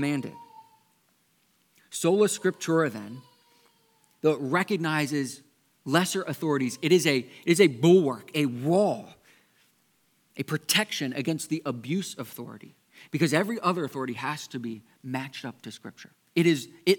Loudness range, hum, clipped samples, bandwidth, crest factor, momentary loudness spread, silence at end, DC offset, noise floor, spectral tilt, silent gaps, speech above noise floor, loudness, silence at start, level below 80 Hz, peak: 6 LU; none; under 0.1%; 19 kHz; 22 dB; 18 LU; 0 s; under 0.1%; -68 dBFS; -5 dB/octave; none; 42 dB; -26 LUFS; 0 s; -80 dBFS; -6 dBFS